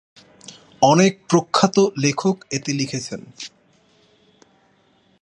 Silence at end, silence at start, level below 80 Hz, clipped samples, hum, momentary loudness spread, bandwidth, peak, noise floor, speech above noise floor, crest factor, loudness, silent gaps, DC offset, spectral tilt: 1.75 s; 0.5 s; -64 dBFS; under 0.1%; none; 18 LU; 11 kHz; -2 dBFS; -59 dBFS; 40 dB; 20 dB; -19 LUFS; none; under 0.1%; -5 dB/octave